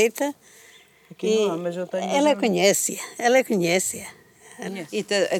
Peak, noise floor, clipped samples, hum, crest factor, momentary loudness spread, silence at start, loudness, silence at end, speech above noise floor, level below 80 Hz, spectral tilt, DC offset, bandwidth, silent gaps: -4 dBFS; -52 dBFS; under 0.1%; none; 18 dB; 14 LU; 0 s; -22 LUFS; 0 s; 29 dB; -72 dBFS; -3.5 dB/octave; under 0.1%; 19.5 kHz; none